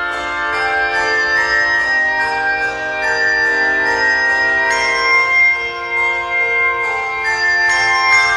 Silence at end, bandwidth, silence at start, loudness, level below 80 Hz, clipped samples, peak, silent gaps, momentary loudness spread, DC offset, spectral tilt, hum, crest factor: 0 s; 12 kHz; 0 s; -13 LUFS; -46 dBFS; under 0.1%; 0 dBFS; none; 6 LU; under 0.1%; -1.5 dB/octave; none; 14 dB